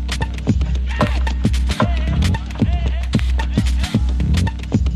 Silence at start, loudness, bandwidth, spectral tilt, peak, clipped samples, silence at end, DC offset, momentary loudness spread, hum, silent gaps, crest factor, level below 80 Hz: 0 s; -19 LUFS; 12 kHz; -6.5 dB/octave; -4 dBFS; under 0.1%; 0 s; under 0.1%; 2 LU; none; none; 14 dB; -20 dBFS